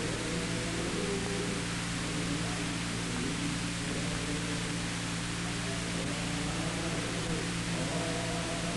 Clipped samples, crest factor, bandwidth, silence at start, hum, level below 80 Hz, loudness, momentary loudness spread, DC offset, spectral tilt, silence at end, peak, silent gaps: under 0.1%; 14 dB; 11.5 kHz; 0 s; none; -48 dBFS; -33 LUFS; 1 LU; under 0.1%; -4 dB/octave; 0 s; -20 dBFS; none